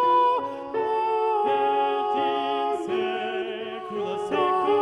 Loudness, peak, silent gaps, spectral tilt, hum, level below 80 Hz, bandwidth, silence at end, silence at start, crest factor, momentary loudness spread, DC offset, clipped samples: -25 LUFS; -12 dBFS; none; -5 dB/octave; none; -68 dBFS; 11 kHz; 0 s; 0 s; 12 dB; 8 LU; under 0.1%; under 0.1%